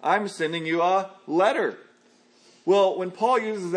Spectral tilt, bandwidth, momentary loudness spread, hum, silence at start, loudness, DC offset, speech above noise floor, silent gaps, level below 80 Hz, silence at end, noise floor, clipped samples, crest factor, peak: -5 dB/octave; 10.5 kHz; 7 LU; none; 0 s; -24 LUFS; under 0.1%; 35 dB; none; -84 dBFS; 0 s; -59 dBFS; under 0.1%; 16 dB; -8 dBFS